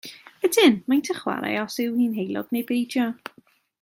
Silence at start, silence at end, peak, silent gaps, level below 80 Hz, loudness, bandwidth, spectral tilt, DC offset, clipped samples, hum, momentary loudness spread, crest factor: 0.05 s; 0.7 s; -6 dBFS; none; -72 dBFS; -23 LUFS; 16.5 kHz; -4 dB/octave; under 0.1%; under 0.1%; none; 11 LU; 18 dB